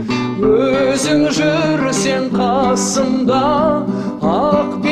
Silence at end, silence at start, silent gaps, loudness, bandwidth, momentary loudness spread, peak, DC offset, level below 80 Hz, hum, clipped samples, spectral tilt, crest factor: 0 s; 0 s; none; -15 LUFS; 13.5 kHz; 3 LU; -2 dBFS; 0.2%; -42 dBFS; none; under 0.1%; -5 dB/octave; 14 dB